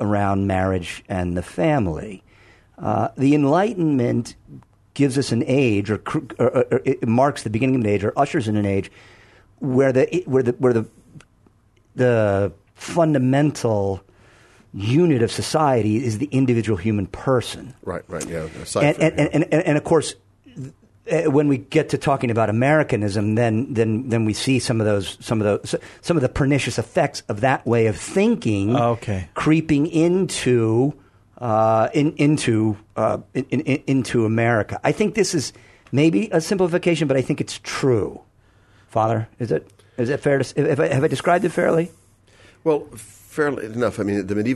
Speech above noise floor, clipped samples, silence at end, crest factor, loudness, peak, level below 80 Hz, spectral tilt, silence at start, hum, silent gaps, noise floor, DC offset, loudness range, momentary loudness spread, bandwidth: 37 dB; under 0.1%; 0 s; 16 dB; -20 LUFS; -4 dBFS; -50 dBFS; -6.5 dB/octave; 0 s; none; none; -57 dBFS; under 0.1%; 3 LU; 9 LU; 12.5 kHz